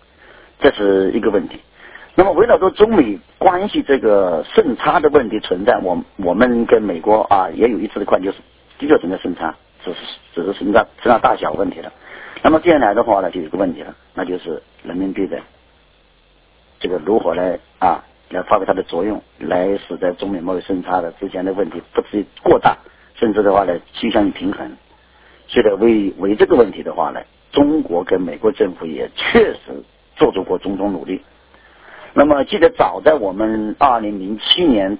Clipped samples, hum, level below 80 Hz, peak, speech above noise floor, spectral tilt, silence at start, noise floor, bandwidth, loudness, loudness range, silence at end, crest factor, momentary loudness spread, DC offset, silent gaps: under 0.1%; none; -44 dBFS; 0 dBFS; 37 dB; -9.5 dB/octave; 0.6 s; -53 dBFS; 4 kHz; -16 LUFS; 6 LU; 0 s; 16 dB; 14 LU; under 0.1%; none